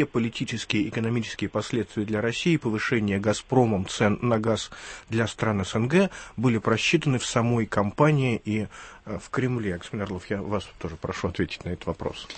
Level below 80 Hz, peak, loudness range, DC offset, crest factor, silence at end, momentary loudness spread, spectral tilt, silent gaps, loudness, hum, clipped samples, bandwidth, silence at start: -52 dBFS; -6 dBFS; 7 LU; under 0.1%; 20 dB; 0 s; 10 LU; -5.5 dB/octave; none; -26 LUFS; none; under 0.1%; 8.8 kHz; 0 s